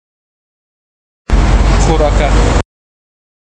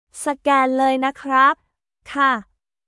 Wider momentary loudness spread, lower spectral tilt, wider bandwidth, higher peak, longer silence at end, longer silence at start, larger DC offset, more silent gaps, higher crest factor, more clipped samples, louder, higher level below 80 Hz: about the same, 9 LU vs 11 LU; first, -5.5 dB/octave vs -2.5 dB/octave; second, 9.2 kHz vs 12 kHz; first, 0 dBFS vs -4 dBFS; first, 0.95 s vs 0.45 s; first, 1.3 s vs 0.15 s; neither; neither; about the same, 12 dB vs 16 dB; neither; first, -12 LUFS vs -18 LUFS; first, -14 dBFS vs -62 dBFS